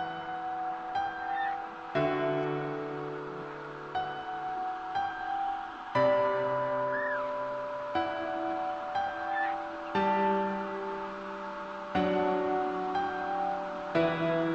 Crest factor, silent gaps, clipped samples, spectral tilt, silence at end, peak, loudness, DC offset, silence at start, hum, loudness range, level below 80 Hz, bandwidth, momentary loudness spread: 16 dB; none; under 0.1%; -7 dB/octave; 0 s; -16 dBFS; -32 LUFS; under 0.1%; 0 s; none; 3 LU; -64 dBFS; 8 kHz; 9 LU